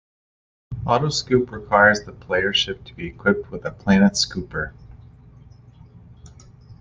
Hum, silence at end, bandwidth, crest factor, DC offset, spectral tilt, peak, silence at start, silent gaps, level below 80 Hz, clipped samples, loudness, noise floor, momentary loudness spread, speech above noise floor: none; 0.05 s; 9.6 kHz; 20 dB; under 0.1%; -4.5 dB/octave; -2 dBFS; 0.7 s; none; -46 dBFS; under 0.1%; -20 LUFS; -46 dBFS; 16 LU; 26 dB